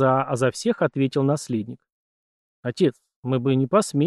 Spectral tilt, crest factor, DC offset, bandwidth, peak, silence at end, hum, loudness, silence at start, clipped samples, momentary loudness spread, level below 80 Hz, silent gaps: -6.5 dB/octave; 18 dB; under 0.1%; 12.5 kHz; -6 dBFS; 0 s; none; -23 LUFS; 0 s; under 0.1%; 12 LU; -68 dBFS; 1.92-2.63 s, 3.16-3.23 s